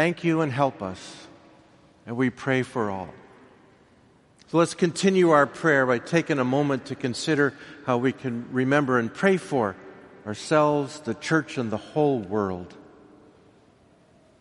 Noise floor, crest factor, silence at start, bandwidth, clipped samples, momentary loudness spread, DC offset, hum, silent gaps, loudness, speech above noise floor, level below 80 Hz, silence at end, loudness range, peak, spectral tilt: -57 dBFS; 20 dB; 0 s; 11.5 kHz; under 0.1%; 14 LU; under 0.1%; none; none; -24 LUFS; 34 dB; -66 dBFS; 1.6 s; 7 LU; -4 dBFS; -6 dB/octave